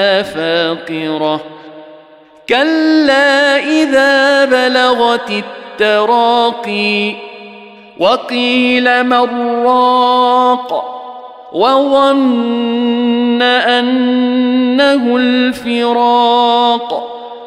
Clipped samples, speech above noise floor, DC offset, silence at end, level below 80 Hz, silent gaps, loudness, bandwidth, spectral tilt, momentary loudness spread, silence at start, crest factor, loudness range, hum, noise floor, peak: under 0.1%; 30 dB; under 0.1%; 0 s; -58 dBFS; none; -11 LUFS; 12 kHz; -4 dB/octave; 10 LU; 0 s; 10 dB; 3 LU; none; -41 dBFS; 0 dBFS